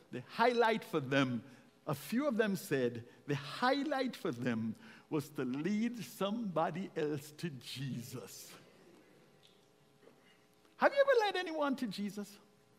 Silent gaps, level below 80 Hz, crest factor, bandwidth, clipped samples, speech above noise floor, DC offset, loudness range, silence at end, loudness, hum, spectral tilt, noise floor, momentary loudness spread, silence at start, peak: none; -82 dBFS; 24 dB; 16 kHz; under 0.1%; 32 dB; under 0.1%; 9 LU; 0.4 s; -36 LUFS; none; -5.5 dB/octave; -67 dBFS; 15 LU; 0.1 s; -14 dBFS